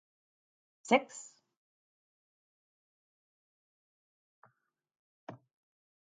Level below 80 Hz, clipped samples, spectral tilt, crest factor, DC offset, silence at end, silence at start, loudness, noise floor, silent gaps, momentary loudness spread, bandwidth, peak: -90 dBFS; under 0.1%; -3.5 dB/octave; 30 dB; under 0.1%; 0.7 s; 0.9 s; -30 LUFS; -80 dBFS; 1.57-4.42 s, 4.99-5.27 s; 24 LU; 9 kHz; -12 dBFS